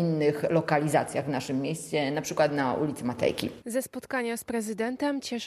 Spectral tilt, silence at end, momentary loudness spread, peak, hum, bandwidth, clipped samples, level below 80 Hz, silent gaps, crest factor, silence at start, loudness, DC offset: -5.5 dB/octave; 0 s; 7 LU; -10 dBFS; none; 14 kHz; under 0.1%; -66 dBFS; none; 18 dB; 0 s; -28 LUFS; under 0.1%